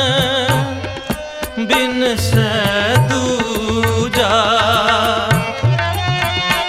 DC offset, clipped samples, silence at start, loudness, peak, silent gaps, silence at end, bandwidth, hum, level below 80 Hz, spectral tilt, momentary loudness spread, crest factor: 0.1%; under 0.1%; 0 s; -15 LUFS; -2 dBFS; none; 0 s; 16 kHz; none; -36 dBFS; -4.5 dB/octave; 10 LU; 14 dB